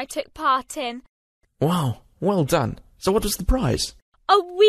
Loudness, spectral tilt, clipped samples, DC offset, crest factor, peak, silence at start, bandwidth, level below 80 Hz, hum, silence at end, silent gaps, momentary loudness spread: -23 LUFS; -5 dB/octave; under 0.1%; under 0.1%; 20 dB; -4 dBFS; 0 s; 14 kHz; -34 dBFS; none; 0 s; 1.09-1.41 s, 4.02-4.12 s; 10 LU